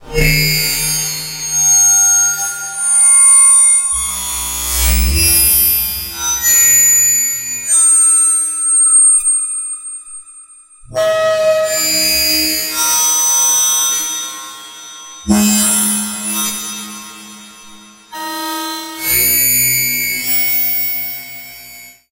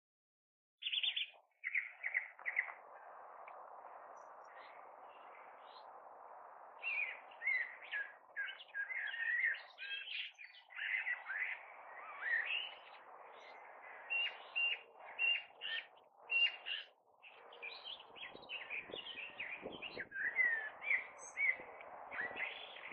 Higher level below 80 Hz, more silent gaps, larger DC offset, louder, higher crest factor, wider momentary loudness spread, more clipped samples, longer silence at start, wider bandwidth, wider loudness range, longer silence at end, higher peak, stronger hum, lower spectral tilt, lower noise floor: first, -30 dBFS vs -90 dBFS; neither; neither; first, -10 LUFS vs -40 LUFS; second, 14 dB vs 22 dB; second, 18 LU vs 21 LU; neither; second, 0 s vs 0.8 s; first, 16.5 kHz vs 6.2 kHz; about the same, 8 LU vs 9 LU; first, 0.2 s vs 0 s; first, 0 dBFS vs -22 dBFS; neither; first, -1 dB/octave vs 4 dB/octave; second, -40 dBFS vs -64 dBFS